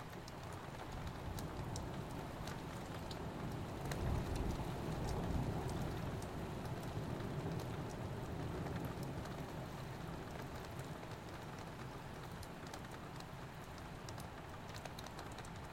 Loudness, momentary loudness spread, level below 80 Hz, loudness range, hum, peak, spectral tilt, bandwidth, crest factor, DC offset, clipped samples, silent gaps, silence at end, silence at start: -46 LUFS; 8 LU; -54 dBFS; 7 LU; none; -26 dBFS; -6 dB/octave; 16.5 kHz; 18 dB; under 0.1%; under 0.1%; none; 0 s; 0 s